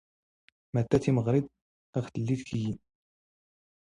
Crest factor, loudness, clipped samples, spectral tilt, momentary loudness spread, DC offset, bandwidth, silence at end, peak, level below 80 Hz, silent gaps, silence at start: 22 dB; -30 LUFS; under 0.1%; -8 dB/octave; 11 LU; under 0.1%; 10.5 kHz; 1.1 s; -10 dBFS; -58 dBFS; 1.62-1.93 s; 0.75 s